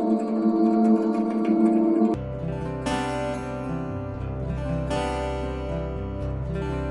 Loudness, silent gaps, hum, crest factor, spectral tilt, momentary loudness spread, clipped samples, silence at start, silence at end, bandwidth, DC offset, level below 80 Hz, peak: -25 LUFS; none; none; 16 dB; -7.5 dB/octave; 10 LU; under 0.1%; 0 s; 0 s; 11.5 kHz; under 0.1%; -38 dBFS; -10 dBFS